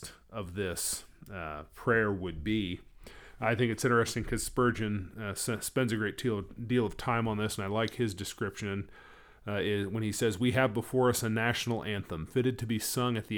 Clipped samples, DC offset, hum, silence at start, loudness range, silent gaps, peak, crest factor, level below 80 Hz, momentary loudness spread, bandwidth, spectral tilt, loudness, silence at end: under 0.1%; under 0.1%; none; 0 s; 3 LU; none; -12 dBFS; 20 dB; -52 dBFS; 10 LU; over 20 kHz; -5 dB/octave; -32 LUFS; 0 s